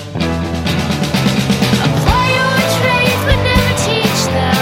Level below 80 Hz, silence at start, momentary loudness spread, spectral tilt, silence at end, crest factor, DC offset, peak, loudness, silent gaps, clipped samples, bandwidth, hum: -26 dBFS; 0 s; 5 LU; -4.5 dB/octave; 0 s; 14 dB; under 0.1%; 0 dBFS; -13 LUFS; none; under 0.1%; 16.5 kHz; none